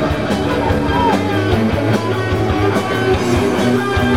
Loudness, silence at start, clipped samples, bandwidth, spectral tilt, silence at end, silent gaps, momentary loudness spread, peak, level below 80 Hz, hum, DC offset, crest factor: -16 LUFS; 0 s; under 0.1%; 16.5 kHz; -6.5 dB/octave; 0 s; none; 2 LU; -2 dBFS; -32 dBFS; none; 1%; 14 dB